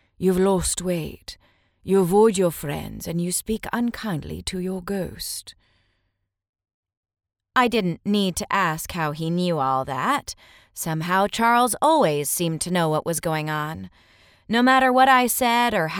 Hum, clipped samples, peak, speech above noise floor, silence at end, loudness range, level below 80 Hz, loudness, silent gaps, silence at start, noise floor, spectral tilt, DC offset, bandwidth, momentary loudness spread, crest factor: none; under 0.1%; -4 dBFS; 53 dB; 0 s; 8 LU; -48 dBFS; -22 LUFS; 6.49-6.53 s, 6.74-6.83 s, 6.97-7.03 s; 0.2 s; -75 dBFS; -4.5 dB/octave; under 0.1%; over 20 kHz; 13 LU; 18 dB